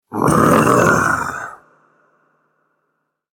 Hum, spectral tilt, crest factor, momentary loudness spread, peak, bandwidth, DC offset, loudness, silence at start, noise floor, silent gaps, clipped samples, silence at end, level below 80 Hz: none; -5.5 dB/octave; 18 dB; 16 LU; 0 dBFS; 17 kHz; under 0.1%; -14 LUFS; 0.1 s; -71 dBFS; none; under 0.1%; 1.8 s; -44 dBFS